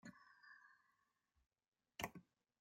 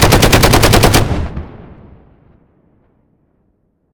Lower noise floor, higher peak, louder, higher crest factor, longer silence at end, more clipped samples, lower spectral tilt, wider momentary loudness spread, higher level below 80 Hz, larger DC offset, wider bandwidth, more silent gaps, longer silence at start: first, under -90 dBFS vs -60 dBFS; second, -28 dBFS vs 0 dBFS; second, -55 LUFS vs -9 LUFS; first, 32 dB vs 14 dB; second, 0.35 s vs 2.35 s; second, under 0.1% vs 0.3%; about the same, -3.5 dB/octave vs -4 dB/octave; second, 15 LU vs 19 LU; second, -80 dBFS vs -22 dBFS; neither; second, 16 kHz vs over 20 kHz; first, 1.68-1.72 s vs none; about the same, 0.05 s vs 0 s